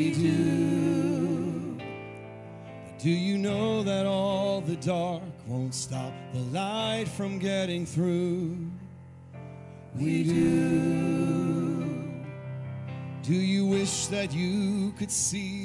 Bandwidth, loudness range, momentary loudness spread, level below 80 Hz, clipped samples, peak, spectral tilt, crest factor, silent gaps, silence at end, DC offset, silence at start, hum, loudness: 11.5 kHz; 3 LU; 17 LU; -62 dBFS; under 0.1%; -14 dBFS; -5.5 dB/octave; 14 dB; none; 0 s; under 0.1%; 0 s; none; -28 LUFS